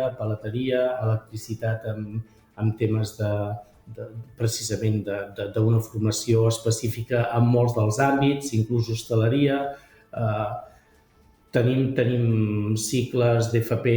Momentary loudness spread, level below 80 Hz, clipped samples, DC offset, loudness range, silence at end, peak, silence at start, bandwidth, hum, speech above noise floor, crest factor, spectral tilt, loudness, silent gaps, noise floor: 12 LU; -54 dBFS; under 0.1%; under 0.1%; 5 LU; 0 s; -8 dBFS; 0 s; over 20 kHz; none; 34 dB; 16 dB; -6 dB/octave; -24 LUFS; none; -58 dBFS